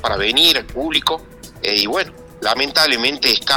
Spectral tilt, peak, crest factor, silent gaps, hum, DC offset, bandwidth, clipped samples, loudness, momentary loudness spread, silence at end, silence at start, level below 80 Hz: -2 dB/octave; -2 dBFS; 16 dB; none; none; under 0.1%; over 20 kHz; under 0.1%; -15 LUFS; 12 LU; 0 s; 0 s; -42 dBFS